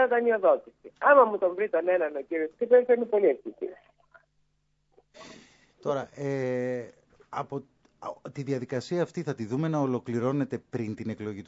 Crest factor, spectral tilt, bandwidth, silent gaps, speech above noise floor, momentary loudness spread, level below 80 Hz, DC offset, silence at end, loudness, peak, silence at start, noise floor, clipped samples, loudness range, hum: 22 dB; -7.5 dB/octave; 8 kHz; none; 45 dB; 17 LU; -74 dBFS; under 0.1%; 0.05 s; -27 LUFS; -6 dBFS; 0 s; -72 dBFS; under 0.1%; 11 LU; none